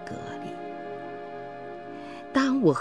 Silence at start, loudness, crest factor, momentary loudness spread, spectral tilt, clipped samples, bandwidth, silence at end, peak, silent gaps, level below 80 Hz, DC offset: 0 s; -31 LUFS; 20 dB; 17 LU; -6.5 dB/octave; under 0.1%; 10.5 kHz; 0 s; -10 dBFS; none; -64 dBFS; 0.2%